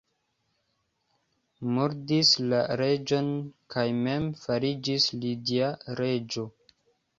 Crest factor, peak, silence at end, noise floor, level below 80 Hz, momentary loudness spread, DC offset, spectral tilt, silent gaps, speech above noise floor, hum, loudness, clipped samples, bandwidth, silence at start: 20 dB; -8 dBFS; 0.7 s; -76 dBFS; -64 dBFS; 12 LU; under 0.1%; -5 dB/octave; none; 48 dB; none; -27 LUFS; under 0.1%; 7.8 kHz; 1.6 s